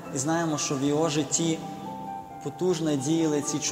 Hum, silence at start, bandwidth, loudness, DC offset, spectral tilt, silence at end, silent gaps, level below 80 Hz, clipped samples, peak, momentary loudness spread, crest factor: none; 0 s; 16 kHz; -27 LUFS; under 0.1%; -4.5 dB/octave; 0 s; none; -64 dBFS; under 0.1%; -10 dBFS; 12 LU; 16 dB